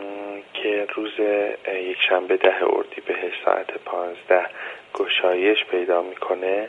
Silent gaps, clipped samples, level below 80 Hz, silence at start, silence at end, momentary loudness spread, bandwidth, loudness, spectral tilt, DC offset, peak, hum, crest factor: none; under 0.1%; -74 dBFS; 0 s; 0 s; 10 LU; 7.2 kHz; -22 LUFS; -4 dB/octave; under 0.1%; -2 dBFS; none; 20 dB